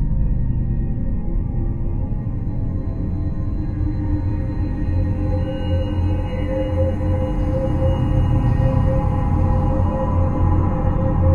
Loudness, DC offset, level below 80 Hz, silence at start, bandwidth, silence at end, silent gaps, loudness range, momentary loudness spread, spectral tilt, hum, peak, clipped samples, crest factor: -21 LUFS; under 0.1%; -24 dBFS; 0 s; 4.3 kHz; 0 s; none; 5 LU; 6 LU; -10 dB/octave; none; -4 dBFS; under 0.1%; 14 dB